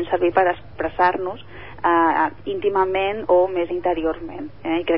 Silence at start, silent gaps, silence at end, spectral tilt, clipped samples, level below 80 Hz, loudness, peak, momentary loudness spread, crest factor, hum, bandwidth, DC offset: 0 s; none; 0 s; -10 dB/octave; under 0.1%; -48 dBFS; -21 LUFS; -4 dBFS; 13 LU; 16 dB; none; 5.6 kHz; 0.8%